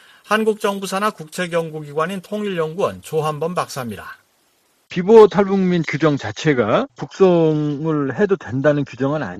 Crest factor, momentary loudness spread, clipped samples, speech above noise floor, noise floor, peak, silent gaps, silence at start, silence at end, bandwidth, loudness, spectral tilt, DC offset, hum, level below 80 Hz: 18 dB; 12 LU; under 0.1%; 43 dB; -61 dBFS; 0 dBFS; none; 0.3 s; 0 s; 13.5 kHz; -18 LUFS; -6.5 dB/octave; under 0.1%; none; -56 dBFS